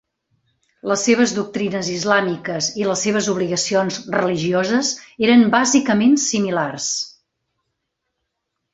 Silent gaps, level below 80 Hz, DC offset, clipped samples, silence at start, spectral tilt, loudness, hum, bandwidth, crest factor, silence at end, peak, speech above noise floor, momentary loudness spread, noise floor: none; -60 dBFS; under 0.1%; under 0.1%; 0.85 s; -3.5 dB/octave; -18 LUFS; none; 8 kHz; 18 dB; 1.65 s; -2 dBFS; 59 dB; 8 LU; -77 dBFS